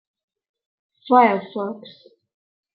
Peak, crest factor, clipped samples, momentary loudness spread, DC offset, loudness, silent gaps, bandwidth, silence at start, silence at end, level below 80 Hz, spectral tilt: -2 dBFS; 22 dB; under 0.1%; 16 LU; under 0.1%; -19 LUFS; none; 5.2 kHz; 1.05 s; 0.85 s; -80 dBFS; -9.5 dB/octave